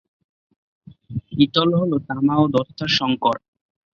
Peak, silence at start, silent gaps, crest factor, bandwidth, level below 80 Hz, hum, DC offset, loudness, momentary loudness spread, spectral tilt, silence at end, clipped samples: -4 dBFS; 1.1 s; none; 18 dB; 7 kHz; -54 dBFS; none; under 0.1%; -20 LUFS; 13 LU; -6.5 dB/octave; 0.6 s; under 0.1%